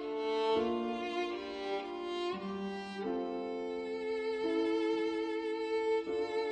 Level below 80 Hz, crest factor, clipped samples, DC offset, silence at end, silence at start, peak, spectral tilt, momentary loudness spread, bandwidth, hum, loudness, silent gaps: -70 dBFS; 16 dB; under 0.1%; under 0.1%; 0 s; 0 s; -20 dBFS; -5.5 dB/octave; 7 LU; 9.2 kHz; none; -36 LUFS; none